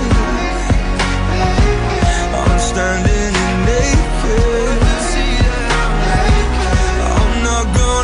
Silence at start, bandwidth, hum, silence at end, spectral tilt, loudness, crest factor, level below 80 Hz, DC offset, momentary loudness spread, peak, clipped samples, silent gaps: 0 s; 10.5 kHz; none; 0 s; -5 dB/octave; -15 LUFS; 10 dB; -16 dBFS; under 0.1%; 2 LU; -2 dBFS; under 0.1%; none